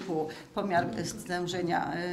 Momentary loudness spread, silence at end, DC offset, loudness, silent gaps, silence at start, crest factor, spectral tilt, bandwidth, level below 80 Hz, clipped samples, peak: 6 LU; 0 s; under 0.1%; -32 LUFS; none; 0 s; 18 dB; -5 dB/octave; 15.5 kHz; -60 dBFS; under 0.1%; -14 dBFS